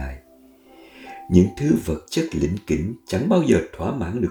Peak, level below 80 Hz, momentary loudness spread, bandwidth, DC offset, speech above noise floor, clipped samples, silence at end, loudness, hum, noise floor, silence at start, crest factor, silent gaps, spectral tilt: -2 dBFS; -40 dBFS; 20 LU; 19 kHz; under 0.1%; 31 dB; under 0.1%; 0 s; -21 LUFS; none; -51 dBFS; 0 s; 20 dB; none; -7 dB/octave